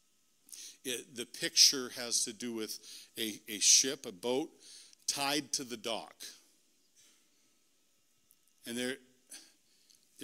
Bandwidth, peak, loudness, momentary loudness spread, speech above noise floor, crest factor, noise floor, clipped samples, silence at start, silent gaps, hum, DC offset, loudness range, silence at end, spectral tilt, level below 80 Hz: 16 kHz; -10 dBFS; -31 LUFS; 27 LU; 40 dB; 28 dB; -74 dBFS; under 0.1%; 0.5 s; none; none; under 0.1%; 17 LU; 0 s; 0 dB/octave; -84 dBFS